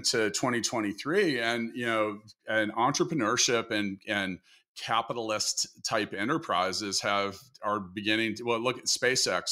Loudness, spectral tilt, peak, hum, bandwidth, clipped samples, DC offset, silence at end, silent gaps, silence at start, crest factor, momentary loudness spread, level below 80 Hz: -29 LUFS; -2.5 dB/octave; -12 dBFS; none; 16 kHz; under 0.1%; under 0.1%; 0 s; 4.68-4.75 s; 0 s; 18 dB; 7 LU; -72 dBFS